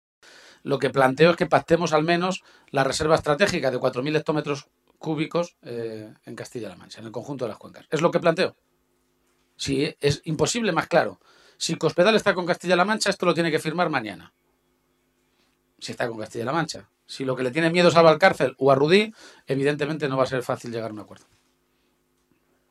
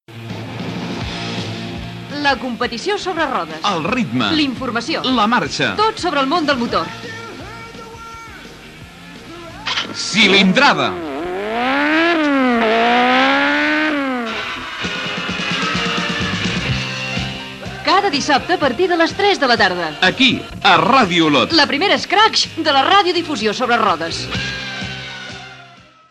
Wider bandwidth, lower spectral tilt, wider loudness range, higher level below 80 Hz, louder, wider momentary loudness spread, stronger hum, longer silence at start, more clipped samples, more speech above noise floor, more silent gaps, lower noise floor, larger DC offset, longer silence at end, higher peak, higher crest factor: about the same, 13 kHz vs 13.5 kHz; about the same, -5 dB/octave vs -4 dB/octave; about the same, 10 LU vs 8 LU; second, -58 dBFS vs -44 dBFS; second, -23 LUFS vs -16 LUFS; about the same, 18 LU vs 17 LU; neither; first, 0.65 s vs 0.1 s; neither; first, 46 dB vs 28 dB; neither; first, -68 dBFS vs -43 dBFS; neither; first, 1.55 s vs 0.35 s; second, -4 dBFS vs 0 dBFS; about the same, 20 dB vs 16 dB